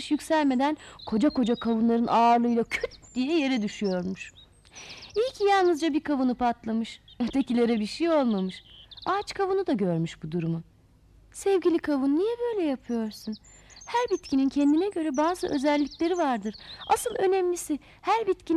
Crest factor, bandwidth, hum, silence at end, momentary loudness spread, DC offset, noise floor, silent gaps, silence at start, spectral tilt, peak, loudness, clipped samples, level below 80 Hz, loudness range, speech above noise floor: 14 dB; 14 kHz; none; 0 s; 12 LU; under 0.1%; -57 dBFS; none; 0 s; -5.5 dB/octave; -12 dBFS; -26 LUFS; under 0.1%; -58 dBFS; 3 LU; 31 dB